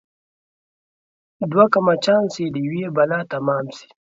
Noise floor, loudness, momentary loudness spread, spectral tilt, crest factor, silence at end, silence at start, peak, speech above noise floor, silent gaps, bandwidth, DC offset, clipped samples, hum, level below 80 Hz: under -90 dBFS; -19 LUFS; 10 LU; -6.5 dB/octave; 20 dB; 0.3 s; 1.4 s; 0 dBFS; over 71 dB; none; 7.8 kHz; under 0.1%; under 0.1%; none; -66 dBFS